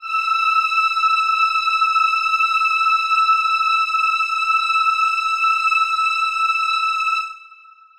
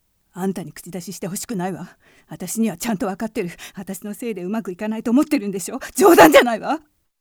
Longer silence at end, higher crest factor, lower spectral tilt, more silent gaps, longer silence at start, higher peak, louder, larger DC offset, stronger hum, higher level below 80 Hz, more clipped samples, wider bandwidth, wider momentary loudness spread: about the same, 0.45 s vs 0.4 s; second, 12 dB vs 20 dB; second, 5.5 dB/octave vs -4.5 dB/octave; neither; second, 0 s vs 0.35 s; second, -6 dBFS vs 0 dBFS; first, -16 LUFS vs -19 LUFS; neither; neither; second, -66 dBFS vs -54 dBFS; neither; second, 14 kHz vs over 20 kHz; second, 2 LU vs 21 LU